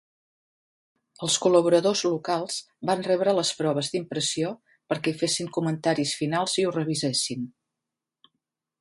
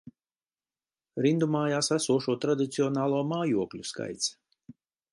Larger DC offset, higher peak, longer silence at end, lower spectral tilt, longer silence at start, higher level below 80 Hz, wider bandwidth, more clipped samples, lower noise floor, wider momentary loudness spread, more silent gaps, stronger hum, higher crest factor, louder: neither; first, -6 dBFS vs -12 dBFS; first, 1.3 s vs 0.4 s; about the same, -4 dB/octave vs -5 dB/octave; first, 1.2 s vs 0.05 s; about the same, -70 dBFS vs -72 dBFS; about the same, 11.5 kHz vs 11.5 kHz; neither; about the same, -87 dBFS vs under -90 dBFS; first, 11 LU vs 8 LU; neither; neither; about the same, 20 dB vs 18 dB; first, -25 LUFS vs -28 LUFS